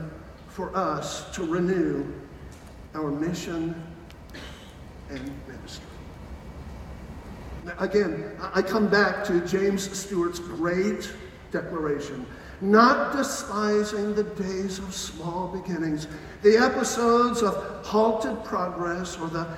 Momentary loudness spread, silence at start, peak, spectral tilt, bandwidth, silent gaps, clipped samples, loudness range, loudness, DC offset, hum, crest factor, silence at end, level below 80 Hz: 21 LU; 0 s; -2 dBFS; -5 dB/octave; 16 kHz; none; under 0.1%; 12 LU; -26 LUFS; under 0.1%; none; 24 dB; 0 s; -48 dBFS